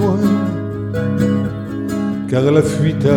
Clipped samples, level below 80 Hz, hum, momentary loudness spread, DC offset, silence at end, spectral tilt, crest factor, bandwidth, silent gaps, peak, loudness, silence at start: under 0.1%; -42 dBFS; none; 8 LU; under 0.1%; 0 s; -7.5 dB/octave; 14 dB; 16.5 kHz; none; -2 dBFS; -17 LUFS; 0 s